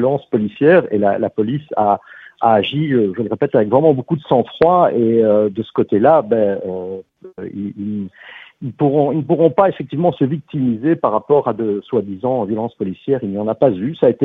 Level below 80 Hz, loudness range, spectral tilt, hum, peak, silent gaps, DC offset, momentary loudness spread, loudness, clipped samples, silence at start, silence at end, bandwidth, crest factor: -56 dBFS; 4 LU; -10.5 dB/octave; none; 0 dBFS; none; under 0.1%; 12 LU; -16 LUFS; under 0.1%; 0 s; 0 s; 4.5 kHz; 16 dB